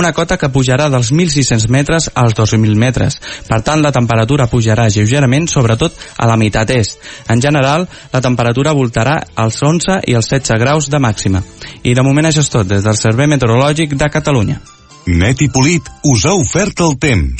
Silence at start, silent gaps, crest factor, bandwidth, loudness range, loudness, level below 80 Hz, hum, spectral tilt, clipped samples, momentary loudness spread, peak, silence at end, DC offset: 0 s; none; 12 dB; 8.8 kHz; 1 LU; -12 LUFS; -30 dBFS; none; -5 dB/octave; under 0.1%; 5 LU; 0 dBFS; 0 s; under 0.1%